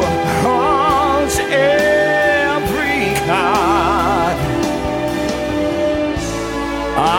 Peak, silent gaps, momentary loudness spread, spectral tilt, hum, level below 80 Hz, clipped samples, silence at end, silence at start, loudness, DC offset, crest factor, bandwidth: -4 dBFS; none; 6 LU; -4.5 dB/octave; none; -34 dBFS; under 0.1%; 0 s; 0 s; -16 LUFS; under 0.1%; 12 dB; 16.5 kHz